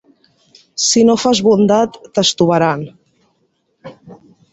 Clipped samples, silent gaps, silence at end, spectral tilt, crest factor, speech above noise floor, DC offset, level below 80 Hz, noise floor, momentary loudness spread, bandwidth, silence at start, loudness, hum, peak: under 0.1%; none; 0.4 s; -4 dB/octave; 16 dB; 51 dB; under 0.1%; -56 dBFS; -63 dBFS; 11 LU; 8.2 kHz; 0.75 s; -13 LUFS; none; 0 dBFS